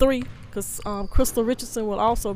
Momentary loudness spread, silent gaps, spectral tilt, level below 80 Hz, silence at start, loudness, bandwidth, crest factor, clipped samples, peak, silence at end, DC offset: 8 LU; none; -4.5 dB/octave; -32 dBFS; 0 s; -25 LUFS; 16 kHz; 18 dB; under 0.1%; -4 dBFS; 0 s; under 0.1%